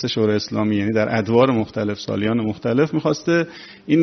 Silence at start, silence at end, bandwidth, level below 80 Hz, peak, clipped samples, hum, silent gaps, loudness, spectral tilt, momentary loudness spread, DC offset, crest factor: 0 s; 0 s; 6.4 kHz; -56 dBFS; -2 dBFS; under 0.1%; none; none; -20 LUFS; -5.5 dB/octave; 7 LU; under 0.1%; 18 dB